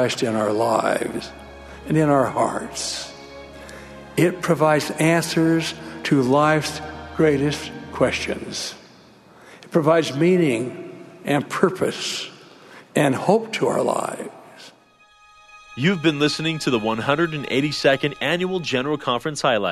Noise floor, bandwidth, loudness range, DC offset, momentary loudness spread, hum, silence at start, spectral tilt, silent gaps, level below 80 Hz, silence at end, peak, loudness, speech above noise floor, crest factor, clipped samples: -54 dBFS; 13.5 kHz; 4 LU; under 0.1%; 17 LU; none; 0 s; -5 dB/octave; none; -52 dBFS; 0 s; 0 dBFS; -21 LUFS; 33 dB; 22 dB; under 0.1%